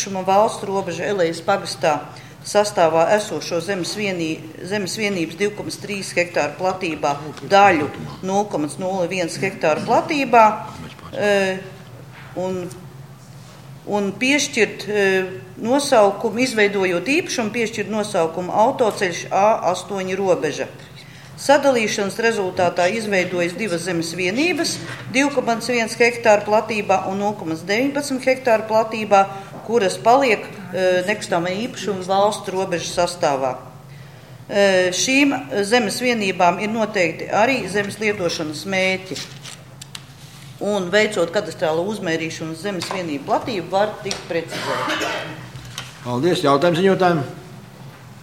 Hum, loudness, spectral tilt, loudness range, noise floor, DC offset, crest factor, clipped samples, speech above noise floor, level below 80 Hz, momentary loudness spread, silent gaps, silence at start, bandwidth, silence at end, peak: none; -19 LUFS; -4 dB/octave; 5 LU; -40 dBFS; 0.1%; 20 dB; under 0.1%; 21 dB; -58 dBFS; 15 LU; none; 0 s; 16.5 kHz; 0 s; 0 dBFS